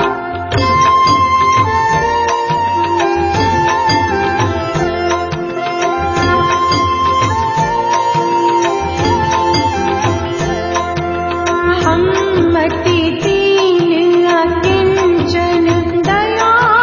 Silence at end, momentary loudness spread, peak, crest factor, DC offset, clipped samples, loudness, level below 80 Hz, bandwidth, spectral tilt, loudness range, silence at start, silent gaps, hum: 0 s; 6 LU; 0 dBFS; 12 dB; under 0.1%; under 0.1%; -13 LUFS; -32 dBFS; 7.4 kHz; -5 dB/octave; 2 LU; 0 s; none; none